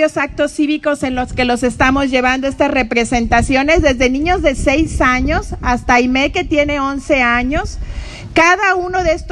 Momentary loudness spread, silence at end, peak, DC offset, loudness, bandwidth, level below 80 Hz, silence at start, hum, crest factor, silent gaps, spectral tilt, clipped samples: 7 LU; 0 s; 0 dBFS; under 0.1%; -14 LUFS; 12 kHz; -26 dBFS; 0 s; none; 14 dB; none; -4.5 dB/octave; under 0.1%